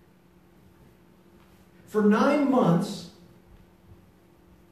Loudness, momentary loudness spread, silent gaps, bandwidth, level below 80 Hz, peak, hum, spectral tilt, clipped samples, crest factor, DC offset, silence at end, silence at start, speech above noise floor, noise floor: -23 LUFS; 16 LU; none; 14 kHz; -64 dBFS; -10 dBFS; none; -7.5 dB/octave; under 0.1%; 18 dB; under 0.1%; 1.65 s; 1.95 s; 36 dB; -58 dBFS